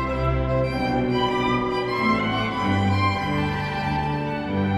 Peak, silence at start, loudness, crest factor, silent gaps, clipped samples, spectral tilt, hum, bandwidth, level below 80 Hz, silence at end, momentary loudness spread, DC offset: -10 dBFS; 0 s; -23 LUFS; 14 dB; none; under 0.1%; -7 dB/octave; none; 14 kHz; -36 dBFS; 0 s; 4 LU; under 0.1%